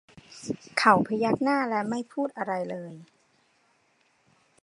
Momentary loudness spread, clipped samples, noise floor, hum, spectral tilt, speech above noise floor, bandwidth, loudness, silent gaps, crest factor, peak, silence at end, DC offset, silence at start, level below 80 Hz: 16 LU; under 0.1%; -67 dBFS; none; -5.5 dB/octave; 41 dB; 11 kHz; -26 LUFS; none; 24 dB; -4 dBFS; 1.6 s; under 0.1%; 0.3 s; -70 dBFS